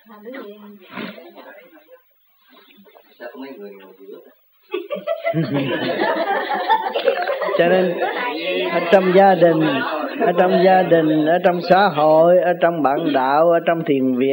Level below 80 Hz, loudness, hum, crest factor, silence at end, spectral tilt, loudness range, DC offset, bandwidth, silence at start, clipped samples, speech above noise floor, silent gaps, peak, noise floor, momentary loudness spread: -70 dBFS; -17 LUFS; none; 16 dB; 0 s; -8.5 dB/octave; 22 LU; under 0.1%; 16.5 kHz; 0.1 s; under 0.1%; 37 dB; none; 0 dBFS; -54 dBFS; 21 LU